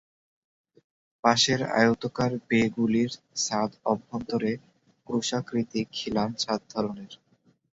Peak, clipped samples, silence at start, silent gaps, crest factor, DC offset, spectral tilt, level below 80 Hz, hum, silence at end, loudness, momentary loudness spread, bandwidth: -6 dBFS; under 0.1%; 1.25 s; none; 22 dB; under 0.1%; -4 dB/octave; -62 dBFS; none; 0.6 s; -27 LUFS; 9 LU; 8 kHz